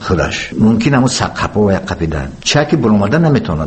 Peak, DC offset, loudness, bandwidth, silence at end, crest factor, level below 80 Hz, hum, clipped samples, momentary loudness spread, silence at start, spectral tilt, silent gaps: 0 dBFS; under 0.1%; -13 LUFS; 8.8 kHz; 0 s; 12 dB; -32 dBFS; none; under 0.1%; 6 LU; 0 s; -5.5 dB/octave; none